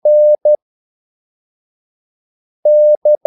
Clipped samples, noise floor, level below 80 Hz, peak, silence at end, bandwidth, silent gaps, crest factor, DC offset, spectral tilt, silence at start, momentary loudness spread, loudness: under 0.1%; under -90 dBFS; -88 dBFS; -4 dBFS; 0.1 s; 0.9 kHz; 0.62-2.63 s, 2.97-3.02 s; 10 dB; under 0.1%; -10 dB/octave; 0.05 s; 8 LU; -11 LUFS